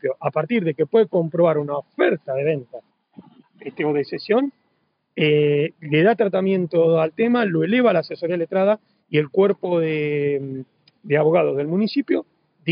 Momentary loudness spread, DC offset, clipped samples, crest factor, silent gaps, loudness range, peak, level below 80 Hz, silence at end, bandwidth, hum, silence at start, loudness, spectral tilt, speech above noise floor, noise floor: 8 LU; under 0.1%; under 0.1%; 14 dB; none; 5 LU; -6 dBFS; -80 dBFS; 0 s; 5.2 kHz; none; 0.05 s; -20 LUFS; -5.5 dB/octave; 49 dB; -68 dBFS